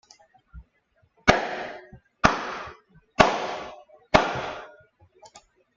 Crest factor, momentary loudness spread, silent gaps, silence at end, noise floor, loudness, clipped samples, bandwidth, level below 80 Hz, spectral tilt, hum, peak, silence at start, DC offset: 26 dB; 19 LU; none; 0.4 s; -67 dBFS; -24 LUFS; under 0.1%; 7.8 kHz; -46 dBFS; -4 dB/octave; none; -2 dBFS; 0.55 s; under 0.1%